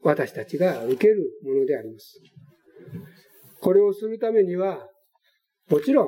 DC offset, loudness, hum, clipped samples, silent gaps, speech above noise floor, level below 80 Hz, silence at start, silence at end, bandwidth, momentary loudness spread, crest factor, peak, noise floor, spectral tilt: under 0.1%; -23 LUFS; none; under 0.1%; none; 48 dB; -76 dBFS; 0.05 s; 0 s; 16.5 kHz; 21 LU; 18 dB; -6 dBFS; -70 dBFS; -7.5 dB/octave